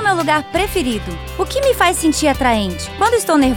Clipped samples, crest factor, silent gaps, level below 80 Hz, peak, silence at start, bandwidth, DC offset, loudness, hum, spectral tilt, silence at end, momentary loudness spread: under 0.1%; 14 dB; none; -32 dBFS; -2 dBFS; 0 s; 20 kHz; 0.1%; -16 LUFS; none; -4 dB/octave; 0 s; 9 LU